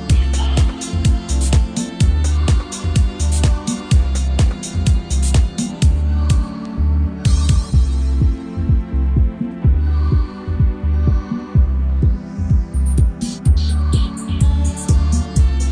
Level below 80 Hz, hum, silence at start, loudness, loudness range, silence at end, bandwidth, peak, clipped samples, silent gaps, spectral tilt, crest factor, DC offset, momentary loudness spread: -16 dBFS; none; 0 s; -18 LUFS; 1 LU; 0 s; 10 kHz; -2 dBFS; under 0.1%; none; -6 dB/octave; 12 dB; under 0.1%; 3 LU